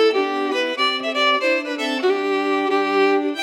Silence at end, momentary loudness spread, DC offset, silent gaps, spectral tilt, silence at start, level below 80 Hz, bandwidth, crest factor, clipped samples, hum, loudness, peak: 0 s; 4 LU; under 0.1%; none; -2.5 dB/octave; 0 s; under -90 dBFS; 12 kHz; 14 dB; under 0.1%; none; -19 LUFS; -6 dBFS